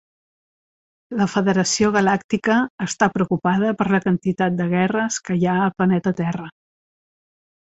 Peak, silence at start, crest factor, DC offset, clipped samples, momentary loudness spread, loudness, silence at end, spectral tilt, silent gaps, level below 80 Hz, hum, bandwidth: -2 dBFS; 1.1 s; 18 dB; under 0.1%; under 0.1%; 6 LU; -20 LUFS; 1.25 s; -5.5 dB/octave; 2.24-2.29 s, 2.70-2.78 s; -56 dBFS; none; 8.2 kHz